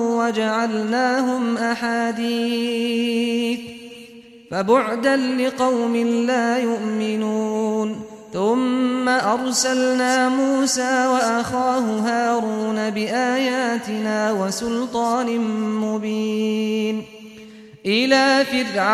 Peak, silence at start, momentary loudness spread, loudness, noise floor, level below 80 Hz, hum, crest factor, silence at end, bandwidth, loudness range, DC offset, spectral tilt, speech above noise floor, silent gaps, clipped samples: -4 dBFS; 0 s; 6 LU; -20 LUFS; -43 dBFS; -62 dBFS; none; 16 dB; 0 s; 14 kHz; 3 LU; under 0.1%; -3.5 dB/octave; 23 dB; none; under 0.1%